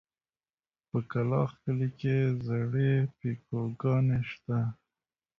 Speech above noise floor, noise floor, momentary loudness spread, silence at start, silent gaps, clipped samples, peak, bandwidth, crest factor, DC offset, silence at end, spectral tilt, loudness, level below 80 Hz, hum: over 61 dB; under -90 dBFS; 8 LU; 0.95 s; none; under 0.1%; -16 dBFS; 5.8 kHz; 14 dB; under 0.1%; 0.65 s; -10 dB/octave; -31 LUFS; -60 dBFS; none